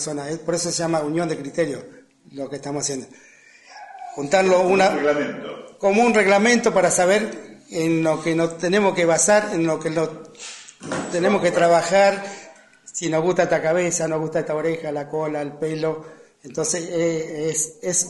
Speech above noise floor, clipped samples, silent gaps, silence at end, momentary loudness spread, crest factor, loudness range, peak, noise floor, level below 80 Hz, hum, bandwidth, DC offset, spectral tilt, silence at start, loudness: 27 dB; under 0.1%; none; 0 s; 17 LU; 18 dB; 7 LU; -4 dBFS; -47 dBFS; -62 dBFS; none; 11.5 kHz; under 0.1%; -4 dB/octave; 0 s; -20 LUFS